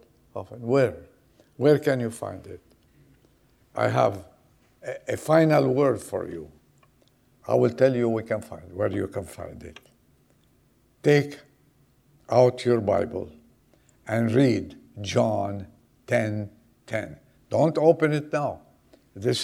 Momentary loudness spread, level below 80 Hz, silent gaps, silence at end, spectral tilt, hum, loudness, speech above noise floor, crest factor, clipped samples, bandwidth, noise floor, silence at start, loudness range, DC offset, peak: 20 LU; -60 dBFS; none; 0 s; -6.5 dB/octave; none; -24 LUFS; 39 dB; 20 dB; under 0.1%; 15.5 kHz; -63 dBFS; 0.35 s; 4 LU; under 0.1%; -6 dBFS